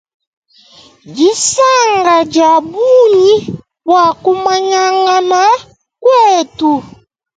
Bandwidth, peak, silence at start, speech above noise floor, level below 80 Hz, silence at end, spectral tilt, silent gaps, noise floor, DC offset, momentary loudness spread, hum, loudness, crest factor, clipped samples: 9.4 kHz; 0 dBFS; 1.05 s; 33 dB; -54 dBFS; 0.5 s; -3 dB/octave; none; -42 dBFS; under 0.1%; 7 LU; none; -10 LUFS; 10 dB; under 0.1%